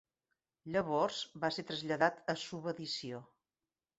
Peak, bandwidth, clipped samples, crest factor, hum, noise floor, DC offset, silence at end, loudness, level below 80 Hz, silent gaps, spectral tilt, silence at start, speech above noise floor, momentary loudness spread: -14 dBFS; 8 kHz; under 0.1%; 24 dB; none; under -90 dBFS; under 0.1%; 0.75 s; -37 LUFS; -74 dBFS; none; -3 dB/octave; 0.65 s; over 53 dB; 9 LU